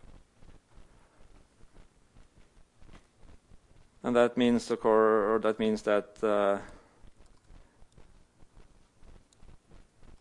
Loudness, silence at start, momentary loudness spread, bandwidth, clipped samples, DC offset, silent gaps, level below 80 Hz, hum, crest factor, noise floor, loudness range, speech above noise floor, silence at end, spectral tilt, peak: -28 LUFS; 0.45 s; 7 LU; 11.5 kHz; under 0.1%; under 0.1%; none; -58 dBFS; none; 22 dB; -59 dBFS; 9 LU; 32 dB; 3.5 s; -5.5 dB/octave; -10 dBFS